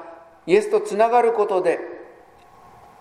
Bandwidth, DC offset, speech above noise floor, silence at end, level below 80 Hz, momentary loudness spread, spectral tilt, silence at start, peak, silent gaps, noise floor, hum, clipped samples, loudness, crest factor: 12.5 kHz; under 0.1%; 31 dB; 0.95 s; -66 dBFS; 20 LU; -5 dB/octave; 0 s; -4 dBFS; none; -49 dBFS; none; under 0.1%; -19 LUFS; 18 dB